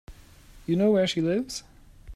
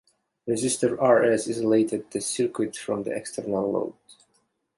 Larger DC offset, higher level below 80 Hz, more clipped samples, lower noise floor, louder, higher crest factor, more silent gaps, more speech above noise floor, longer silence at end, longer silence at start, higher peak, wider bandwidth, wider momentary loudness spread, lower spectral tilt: neither; first, -52 dBFS vs -64 dBFS; neither; second, -50 dBFS vs -70 dBFS; about the same, -25 LUFS vs -25 LUFS; about the same, 16 dB vs 18 dB; neither; second, 26 dB vs 46 dB; second, 0 s vs 0.65 s; second, 0.1 s vs 0.45 s; second, -12 dBFS vs -8 dBFS; first, 14 kHz vs 11.5 kHz; first, 15 LU vs 10 LU; about the same, -5.5 dB/octave vs -4.5 dB/octave